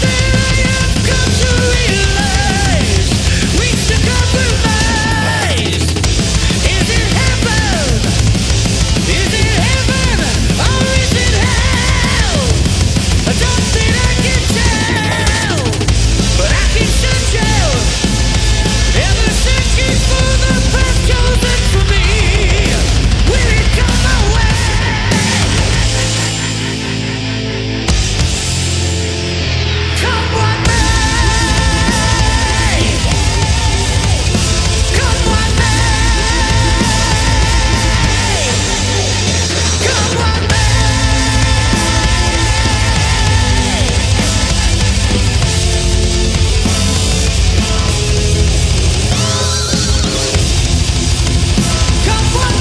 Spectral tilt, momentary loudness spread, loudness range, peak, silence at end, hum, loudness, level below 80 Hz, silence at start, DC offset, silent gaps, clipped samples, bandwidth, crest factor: -4 dB/octave; 2 LU; 1 LU; 0 dBFS; 0 s; none; -12 LUFS; -16 dBFS; 0 s; under 0.1%; none; under 0.1%; 11 kHz; 10 dB